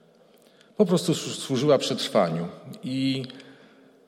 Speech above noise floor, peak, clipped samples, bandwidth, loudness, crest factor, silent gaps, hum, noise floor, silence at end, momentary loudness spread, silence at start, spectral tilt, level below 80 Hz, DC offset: 32 dB; -8 dBFS; under 0.1%; 16.5 kHz; -25 LUFS; 18 dB; none; none; -57 dBFS; 0.55 s; 16 LU; 0.8 s; -5 dB/octave; -72 dBFS; under 0.1%